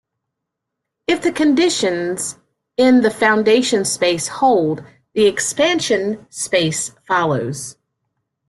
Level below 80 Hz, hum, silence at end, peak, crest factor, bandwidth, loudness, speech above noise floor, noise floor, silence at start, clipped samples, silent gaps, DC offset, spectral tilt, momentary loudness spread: -58 dBFS; none; 0.75 s; -2 dBFS; 16 dB; 12.5 kHz; -17 LUFS; 63 dB; -80 dBFS; 1.1 s; under 0.1%; none; under 0.1%; -3.5 dB/octave; 13 LU